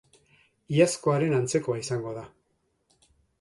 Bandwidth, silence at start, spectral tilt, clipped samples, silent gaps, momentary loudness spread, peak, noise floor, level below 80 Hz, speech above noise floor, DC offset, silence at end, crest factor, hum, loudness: 11.5 kHz; 0.7 s; -5.5 dB/octave; under 0.1%; none; 11 LU; -8 dBFS; -73 dBFS; -66 dBFS; 48 dB; under 0.1%; 1.15 s; 22 dB; none; -26 LUFS